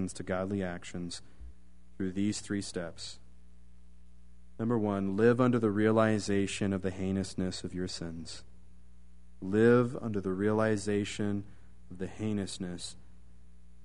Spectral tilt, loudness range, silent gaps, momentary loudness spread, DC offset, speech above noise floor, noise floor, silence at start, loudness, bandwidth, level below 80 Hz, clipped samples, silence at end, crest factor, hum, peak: -6 dB/octave; 9 LU; none; 17 LU; 0.5%; 27 dB; -58 dBFS; 0 s; -32 LUFS; 10.5 kHz; -58 dBFS; under 0.1%; 0.9 s; 20 dB; none; -12 dBFS